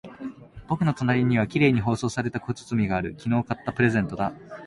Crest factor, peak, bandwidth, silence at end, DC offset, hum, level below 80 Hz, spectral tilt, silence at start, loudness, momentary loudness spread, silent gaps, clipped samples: 18 dB; -8 dBFS; 11.5 kHz; 0 s; under 0.1%; none; -50 dBFS; -7 dB/octave; 0.05 s; -25 LUFS; 10 LU; none; under 0.1%